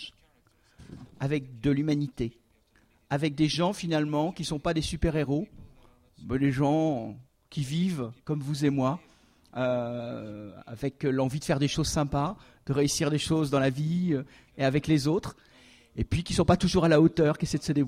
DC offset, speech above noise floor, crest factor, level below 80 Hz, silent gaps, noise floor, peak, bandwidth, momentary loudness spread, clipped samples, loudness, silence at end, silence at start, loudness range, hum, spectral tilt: under 0.1%; 38 dB; 20 dB; -48 dBFS; none; -65 dBFS; -8 dBFS; 15 kHz; 15 LU; under 0.1%; -28 LUFS; 0 s; 0 s; 5 LU; none; -6 dB/octave